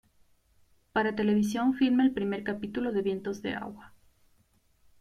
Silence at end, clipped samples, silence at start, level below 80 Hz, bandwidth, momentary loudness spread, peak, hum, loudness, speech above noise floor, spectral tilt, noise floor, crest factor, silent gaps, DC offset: 1.1 s; under 0.1%; 0.95 s; -62 dBFS; 14 kHz; 10 LU; -14 dBFS; none; -29 LUFS; 39 dB; -6 dB/octave; -67 dBFS; 16 dB; none; under 0.1%